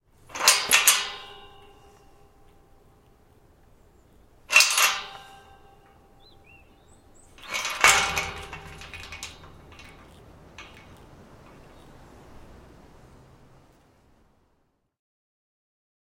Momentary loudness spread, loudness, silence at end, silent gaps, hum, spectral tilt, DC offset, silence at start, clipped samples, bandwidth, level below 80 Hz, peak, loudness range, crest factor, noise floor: 28 LU; -20 LUFS; 5.35 s; none; none; 1 dB/octave; under 0.1%; 0.3 s; under 0.1%; 16.5 kHz; -56 dBFS; 0 dBFS; 18 LU; 30 dB; -70 dBFS